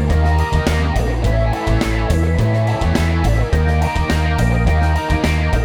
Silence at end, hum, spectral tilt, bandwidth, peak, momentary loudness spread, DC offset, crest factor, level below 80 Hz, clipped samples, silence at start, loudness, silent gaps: 0 s; none; -6.5 dB/octave; 14 kHz; -2 dBFS; 2 LU; under 0.1%; 14 dB; -18 dBFS; under 0.1%; 0 s; -17 LUFS; none